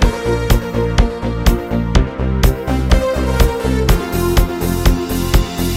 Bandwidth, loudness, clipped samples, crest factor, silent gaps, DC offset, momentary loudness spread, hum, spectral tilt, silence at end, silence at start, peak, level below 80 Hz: 16.5 kHz; -16 LUFS; under 0.1%; 14 dB; none; under 0.1%; 3 LU; none; -6 dB/octave; 0 s; 0 s; 0 dBFS; -16 dBFS